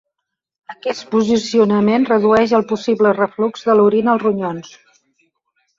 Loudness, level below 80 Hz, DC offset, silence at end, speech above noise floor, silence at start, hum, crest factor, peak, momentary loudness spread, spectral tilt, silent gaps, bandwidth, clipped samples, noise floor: -16 LUFS; -56 dBFS; under 0.1%; 1.1 s; 64 dB; 0.7 s; none; 16 dB; -2 dBFS; 12 LU; -6 dB/octave; none; 7.6 kHz; under 0.1%; -79 dBFS